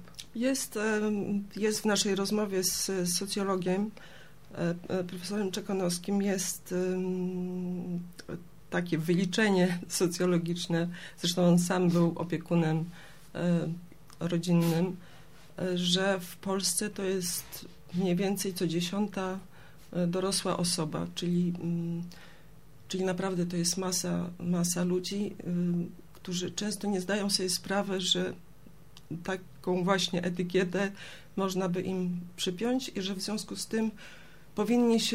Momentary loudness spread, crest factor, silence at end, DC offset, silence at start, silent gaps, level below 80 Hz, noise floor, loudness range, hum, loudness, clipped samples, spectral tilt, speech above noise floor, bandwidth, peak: 11 LU; 20 dB; 0 s; 0.3%; 0 s; none; -62 dBFS; -56 dBFS; 4 LU; none; -31 LUFS; under 0.1%; -4.5 dB/octave; 25 dB; 16 kHz; -12 dBFS